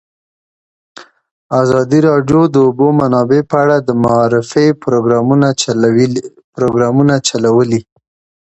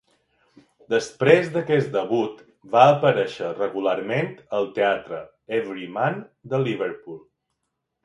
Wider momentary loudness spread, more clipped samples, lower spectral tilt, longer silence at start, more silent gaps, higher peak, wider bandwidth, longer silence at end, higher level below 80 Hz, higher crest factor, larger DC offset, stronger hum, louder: second, 5 LU vs 14 LU; neither; about the same, -6 dB/octave vs -6 dB/octave; about the same, 1 s vs 0.9 s; first, 1.31-1.50 s, 6.44-6.53 s vs none; about the same, 0 dBFS vs 0 dBFS; second, 8.4 kHz vs 11.5 kHz; second, 0.65 s vs 0.85 s; first, -48 dBFS vs -68 dBFS; second, 12 dB vs 22 dB; neither; neither; first, -12 LUFS vs -22 LUFS